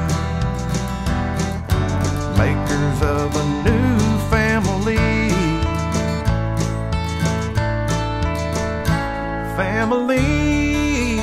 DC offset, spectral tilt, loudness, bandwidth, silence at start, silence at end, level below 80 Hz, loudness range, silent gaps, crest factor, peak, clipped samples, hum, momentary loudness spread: under 0.1%; -6 dB/octave; -20 LUFS; 15.5 kHz; 0 s; 0 s; -28 dBFS; 3 LU; none; 16 dB; -2 dBFS; under 0.1%; none; 5 LU